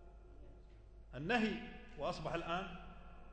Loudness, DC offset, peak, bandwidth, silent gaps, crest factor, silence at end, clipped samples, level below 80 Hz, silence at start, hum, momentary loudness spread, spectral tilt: -41 LUFS; under 0.1%; -20 dBFS; 9 kHz; none; 22 dB; 0 s; under 0.1%; -56 dBFS; 0 s; none; 25 LU; -5.5 dB/octave